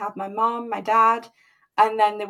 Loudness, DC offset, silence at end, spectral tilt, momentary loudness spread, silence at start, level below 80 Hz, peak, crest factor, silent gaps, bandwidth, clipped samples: -21 LUFS; under 0.1%; 0 s; -4.5 dB/octave; 11 LU; 0 s; -80 dBFS; -4 dBFS; 18 dB; none; 14.5 kHz; under 0.1%